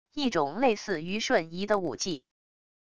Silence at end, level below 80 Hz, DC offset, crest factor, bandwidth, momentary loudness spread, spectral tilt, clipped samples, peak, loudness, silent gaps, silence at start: 0.65 s; -62 dBFS; 0.4%; 18 dB; 11 kHz; 7 LU; -4 dB/octave; under 0.1%; -12 dBFS; -29 LUFS; none; 0.05 s